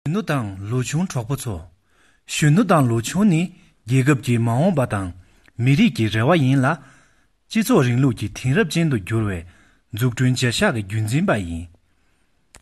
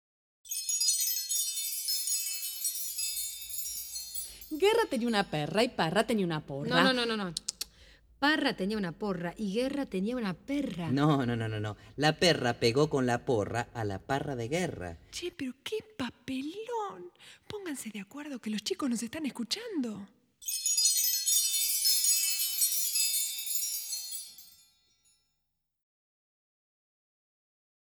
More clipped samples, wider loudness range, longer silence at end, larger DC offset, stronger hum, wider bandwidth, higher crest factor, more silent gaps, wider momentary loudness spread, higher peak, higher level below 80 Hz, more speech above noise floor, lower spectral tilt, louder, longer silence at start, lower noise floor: neither; second, 3 LU vs 11 LU; second, 0.95 s vs 3.4 s; neither; neither; second, 12.5 kHz vs 19.5 kHz; second, 16 dB vs 24 dB; neither; second, 10 LU vs 14 LU; first, -4 dBFS vs -8 dBFS; first, -48 dBFS vs -62 dBFS; second, 45 dB vs 51 dB; first, -6 dB/octave vs -3 dB/octave; first, -20 LUFS vs -30 LUFS; second, 0.05 s vs 0.45 s; second, -64 dBFS vs -82 dBFS